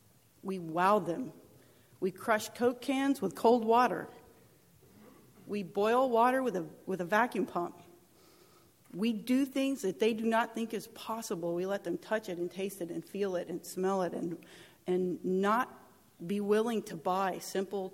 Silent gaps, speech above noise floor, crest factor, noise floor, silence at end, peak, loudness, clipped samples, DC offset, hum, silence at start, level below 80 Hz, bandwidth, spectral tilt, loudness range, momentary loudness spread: none; 30 dB; 20 dB; -62 dBFS; 0.05 s; -12 dBFS; -32 LUFS; under 0.1%; under 0.1%; none; 0.45 s; -76 dBFS; 16.5 kHz; -5.5 dB/octave; 4 LU; 12 LU